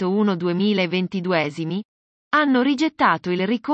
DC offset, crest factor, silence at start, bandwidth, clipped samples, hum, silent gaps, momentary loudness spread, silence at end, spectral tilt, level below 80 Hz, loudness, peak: under 0.1%; 16 dB; 0 s; 8.2 kHz; under 0.1%; none; 1.85-2.31 s; 6 LU; 0 s; -6.5 dB/octave; -68 dBFS; -21 LUFS; -4 dBFS